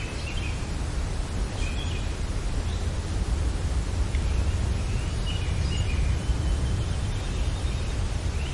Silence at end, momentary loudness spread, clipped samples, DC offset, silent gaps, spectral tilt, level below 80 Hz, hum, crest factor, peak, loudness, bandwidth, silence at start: 0 s; 4 LU; under 0.1%; under 0.1%; none; -5.5 dB/octave; -28 dBFS; none; 14 dB; -12 dBFS; -29 LUFS; 11.5 kHz; 0 s